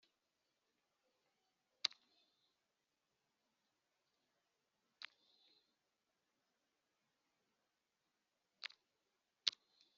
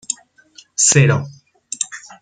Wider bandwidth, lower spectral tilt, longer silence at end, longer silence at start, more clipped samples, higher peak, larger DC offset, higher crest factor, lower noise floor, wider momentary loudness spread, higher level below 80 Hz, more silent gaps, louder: second, 7 kHz vs 9.6 kHz; second, 5.5 dB/octave vs -3.5 dB/octave; first, 0.5 s vs 0.1 s; first, 1.85 s vs 0.1 s; neither; second, -14 dBFS vs -2 dBFS; neither; first, 42 dB vs 18 dB; first, -89 dBFS vs -48 dBFS; second, 15 LU vs 18 LU; second, under -90 dBFS vs -54 dBFS; neither; second, -45 LUFS vs -16 LUFS